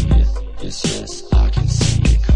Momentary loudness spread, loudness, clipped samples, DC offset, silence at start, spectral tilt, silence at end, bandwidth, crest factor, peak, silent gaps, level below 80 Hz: 10 LU; -18 LUFS; under 0.1%; under 0.1%; 0 s; -5.5 dB/octave; 0 s; 10.5 kHz; 12 dB; -2 dBFS; none; -16 dBFS